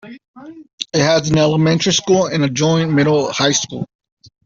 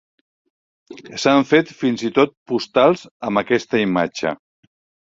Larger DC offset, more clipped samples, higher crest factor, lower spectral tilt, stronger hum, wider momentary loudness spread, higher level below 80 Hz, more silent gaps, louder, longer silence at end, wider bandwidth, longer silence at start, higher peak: neither; neither; about the same, 14 dB vs 18 dB; about the same, -4.5 dB/octave vs -5 dB/octave; neither; about the same, 10 LU vs 9 LU; first, -50 dBFS vs -60 dBFS; second, 0.28-0.34 s, 0.73-0.78 s vs 2.37-2.46 s, 3.11-3.20 s; first, -15 LUFS vs -18 LUFS; second, 0.6 s vs 0.8 s; about the same, 7.6 kHz vs 7.8 kHz; second, 0.05 s vs 0.9 s; about the same, -2 dBFS vs -2 dBFS